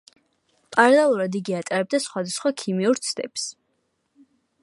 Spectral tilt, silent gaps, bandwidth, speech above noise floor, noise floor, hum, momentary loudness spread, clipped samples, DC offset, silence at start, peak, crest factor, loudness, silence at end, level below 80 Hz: -4 dB/octave; none; 11.5 kHz; 50 dB; -72 dBFS; none; 12 LU; under 0.1%; under 0.1%; 0.7 s; -2 dBFS; 22 dB; -22 LUFS; 1.1 s; -76 dBFS